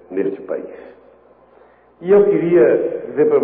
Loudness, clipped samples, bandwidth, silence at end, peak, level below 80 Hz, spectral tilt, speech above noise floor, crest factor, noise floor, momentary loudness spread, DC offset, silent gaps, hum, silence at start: -16 LUFS; under 0.1%; 3.5 kHz; 0 s; -4 dBFS; -60 dBFS; -12.5 dB/octave; 34 dB; 14 dB; -49 dBFS; 15 LU; under 0.1%; none; none; 0.1 s